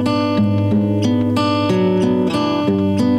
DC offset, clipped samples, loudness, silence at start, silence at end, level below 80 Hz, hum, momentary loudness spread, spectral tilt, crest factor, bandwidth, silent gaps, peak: under 0.1%; under 0.1%; -16 LUFS; 0 s; 0 s; -50 dBFS; none; 1 LU; -7.5 dB/octave; 10 dB; 13 kHz; none; -6 dBFS